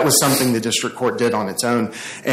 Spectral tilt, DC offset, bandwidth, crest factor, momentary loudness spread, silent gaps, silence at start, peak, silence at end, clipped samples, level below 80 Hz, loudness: -3 dB/octave; under 0.1%; 16 kHz; 16 dB; 8 LU; none; 0 s; -2 dBFS; 0 s; under 0.1%; -58 dBFS; -18 LUFS